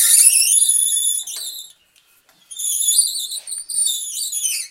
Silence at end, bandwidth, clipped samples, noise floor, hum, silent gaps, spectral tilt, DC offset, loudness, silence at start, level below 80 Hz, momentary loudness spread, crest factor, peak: 0 s; 17 kHz; under 0.1%; -56 dBFS; none; none; 6.5 dB/octave; under 0.1%; -15 LUFS; 0 s; -70 dBFS; 17 LU; 18 dB; 0 dBFS